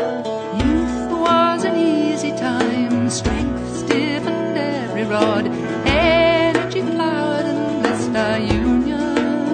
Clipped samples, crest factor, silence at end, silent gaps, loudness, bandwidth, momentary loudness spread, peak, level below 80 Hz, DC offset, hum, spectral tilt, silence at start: under 0.1%; 18 dB; 0 s; none; -18 LUFS; 9.6 kHz; 6 LU; 0 dBFS; -34 dBFS; under 0.1%; none; -5.5 dB/octave; 0 s